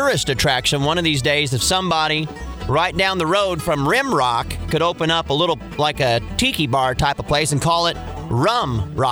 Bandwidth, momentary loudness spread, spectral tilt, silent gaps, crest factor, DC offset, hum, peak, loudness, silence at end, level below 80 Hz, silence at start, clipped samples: over 20 kHz; 5 LU; -4 dB/octave; none; 16 dB; under 0.1%; none; -4 dBFS; -18 LUFS; 0 s; -36 dBFS; 0 s; under 0.1%